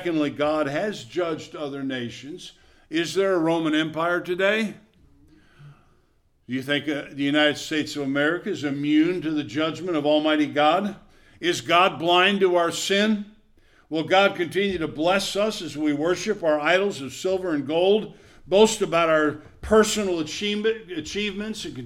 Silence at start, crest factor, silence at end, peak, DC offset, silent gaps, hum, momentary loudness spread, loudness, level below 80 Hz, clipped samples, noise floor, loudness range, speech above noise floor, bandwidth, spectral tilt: 0 s; 18 dB; 0 s; -4 dBFS; under 0.1%; none; none; 12 LU; -23 LUFS; -54 dBFS; under 0.1%; -63 dBFS; 6 LU; 40 dB; 15.5 kHz; -4 dB/octave